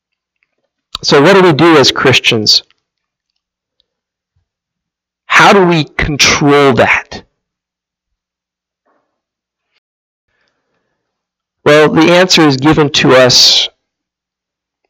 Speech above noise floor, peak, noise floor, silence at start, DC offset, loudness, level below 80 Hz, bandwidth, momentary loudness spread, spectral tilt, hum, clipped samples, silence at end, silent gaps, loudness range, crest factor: 76 dB; 0 dBFS; -83 dBFS; 0.95 s; under 0.1%; -7 LUFS; -38 dBFS; 18.5 kHz; 8 LU; -3.5 dB/octave; none; 0.1%; 1.2 s; 9.78-10.28 s; 7 LU; 12 dB